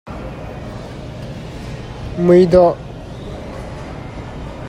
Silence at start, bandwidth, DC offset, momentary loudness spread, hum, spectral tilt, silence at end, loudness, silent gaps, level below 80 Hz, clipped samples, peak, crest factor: 0.05 s; 10.5 kHz; under 0.1%; 19 LU; none; -8 dB/octave; 0 s; -13 LUFS; none; -36 dBFS; under 0.1%; 0 dBFS; 18 dB